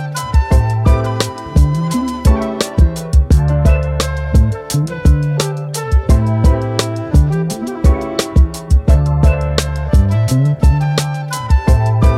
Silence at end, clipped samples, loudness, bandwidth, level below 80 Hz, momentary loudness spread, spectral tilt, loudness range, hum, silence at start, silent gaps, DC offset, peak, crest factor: 0 s; under 0.1%; -14 LUFS; 14.5 kHz; -16 dBFS; 6 LU; -6.5 dB/octave; 1 LU; none; 0 s; none; under 0.1%; 0 dBFS; 12 dB